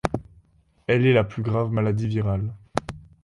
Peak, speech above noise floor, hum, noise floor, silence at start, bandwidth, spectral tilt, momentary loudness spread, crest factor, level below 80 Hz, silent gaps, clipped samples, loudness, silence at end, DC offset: -2 dBFS; 38 dB; none; -59 dBFS; 0.05 s; 11.5 kHz; -7.5 dB/octave; 14 LU; 22 dB; -46 dBFS; none; under 0.1%; -24 LUFS; 0.2 s; under 0.1%